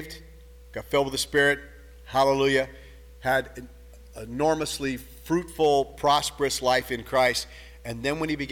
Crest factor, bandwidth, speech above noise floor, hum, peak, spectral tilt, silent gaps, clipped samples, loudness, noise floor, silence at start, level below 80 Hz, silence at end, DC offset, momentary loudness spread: 18 dB; 18.5 kHz; 22 dB; none; -8 dBFS; -3.5 dB/octave; none; under 0.1%; -25 LUFS; -47 dBFS; 0 s; -48 dBFS; 0 s; under 0.1%; 18 LU